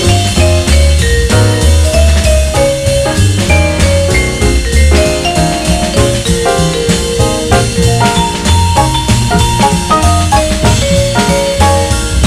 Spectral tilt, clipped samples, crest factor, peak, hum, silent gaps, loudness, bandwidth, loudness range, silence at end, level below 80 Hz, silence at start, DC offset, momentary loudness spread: -4.5 dB/octave; under 0.1%; 8 dB; 0 dBFS; none; none; -10 LUFS; 15.5 kHz; 1 LU; 0 s; -14 dBFS; 0 s; under 0.1%; 3 LU